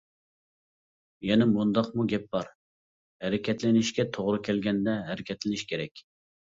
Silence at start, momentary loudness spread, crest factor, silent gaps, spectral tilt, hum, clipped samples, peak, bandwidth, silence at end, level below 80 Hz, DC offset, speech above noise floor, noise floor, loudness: 1.2 s; 11 LU; 18 dB; 2.55-3.20 s, 5.91-5.95 s; -6 dB/octave; none; under 0.1%; -10 dBFS; 7.8 kHz; 0.6 s; -62 dBFS; under 0.1%; over 63 dB; under -90 dBFS; -28 LUFS